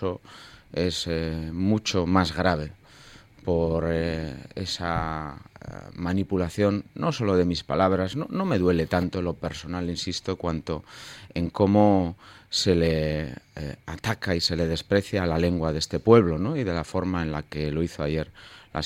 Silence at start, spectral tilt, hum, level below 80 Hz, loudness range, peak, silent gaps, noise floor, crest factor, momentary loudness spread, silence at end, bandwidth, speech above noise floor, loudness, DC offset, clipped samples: 0 s; -6 dB/octave; none; -44 dBFS; 4 LU; -4 dBFS; none; -50 dBFS; 22 dB; 14 LU; 0 s; 15.5 kHz; 25 dB; -26 LUFS; under 0.1%; under 0.1%